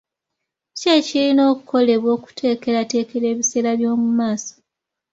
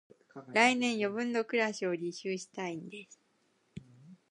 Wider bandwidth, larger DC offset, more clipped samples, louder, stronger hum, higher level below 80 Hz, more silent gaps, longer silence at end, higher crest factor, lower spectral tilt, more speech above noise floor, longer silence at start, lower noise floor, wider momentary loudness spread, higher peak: second, 7.8 kHz vs 10.5 kHz; neither; neither; first, -18 LUFS vs -32 LUFS; neither; first, -66 dBFS vs -78 dBFS; neither; first, 0.65 s vs 0.15 s; second, 16 dB vs 24 dB; about the same, -3.5 dB/octave vs -4 dB/octave; first, 64 dB vs 41 dB; first, 0.75 s vs 0.35 s; first, -82 dBFS vs -73 dBFS; second, 7 LU vs 26 LU; first, -2 dBFS vs -10 dBFS